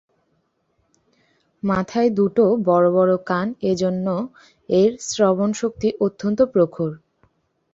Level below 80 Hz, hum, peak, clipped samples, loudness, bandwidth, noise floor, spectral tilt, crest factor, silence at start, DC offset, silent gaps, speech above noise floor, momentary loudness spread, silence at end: -56 dBFS; none; -4 dBFS; under 0.1%; -20 LUFS; 8 kHz; -68 dBFS; -6.5 dB/octave; 18 dB; 1.65 s; under 0.1%; none; 49 dB; 8 LU; 0.75 s